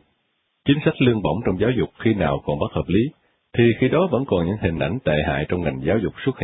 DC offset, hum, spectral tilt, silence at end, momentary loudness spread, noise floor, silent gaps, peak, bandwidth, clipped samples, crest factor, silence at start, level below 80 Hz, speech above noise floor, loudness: under 0.1%; none; -12 dB/octave; 0 s; 6 LU; -70 dBFS; none; -4 dBFS; 4 kHz; under 0.1%; 16 dB; 0.65 s; -40 dBFS; 50 dB; -21 LUFS